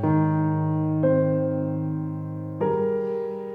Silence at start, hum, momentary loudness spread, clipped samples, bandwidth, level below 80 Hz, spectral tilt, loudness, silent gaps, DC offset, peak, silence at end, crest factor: 0 s; none; 8 LU; under 0.1%; 3.2 kHz; -64 dBFS; -12 dB/octave; -25 LUFS; none; under 0.1%; -10 dBFS; 0 s; 14 dB